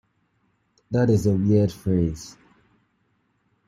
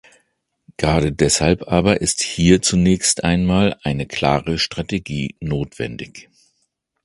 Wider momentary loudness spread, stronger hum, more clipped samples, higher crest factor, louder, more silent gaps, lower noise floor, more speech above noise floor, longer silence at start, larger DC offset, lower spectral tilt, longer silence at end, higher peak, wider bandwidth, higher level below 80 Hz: about the same, 12 LU vs 11 LU; neither; neither; about the same, 18 dB vs 18 dB; second, -22 LUFS vs -18 LUFS; neither; about the same, -69 dBFS vs -70 dBFS; second, 48 dB vs 52 dB; about the same, 0.9 s vs 0.8 s; neither; first, -8 dB/octave vs -4.5 dB/octave; first, 1.4 s vs 0.8 s; second, -8 dBFS vs 0 dBFS; first, 13 kHz vs 11.5 kHz; second, -50 dBFS vs -36 dBFS